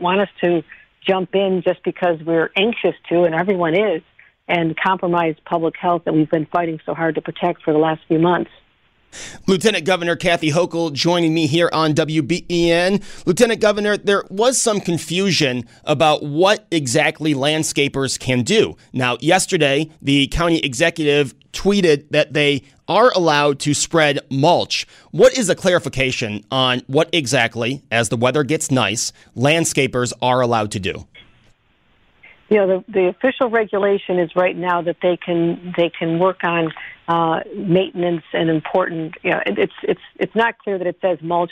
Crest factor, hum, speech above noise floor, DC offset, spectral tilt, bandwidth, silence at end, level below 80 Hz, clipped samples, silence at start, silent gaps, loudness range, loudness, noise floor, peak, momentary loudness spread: 16 dB; none; 41 dB; under 0.1%; -4.5 dB/octave; 15.5 kHz; 0.05 s; -46 dBFS; under 0.1%; 0 s; none; 3 LU; -18 LUFS; -59 dBFS; -2 dBFS; 6 LU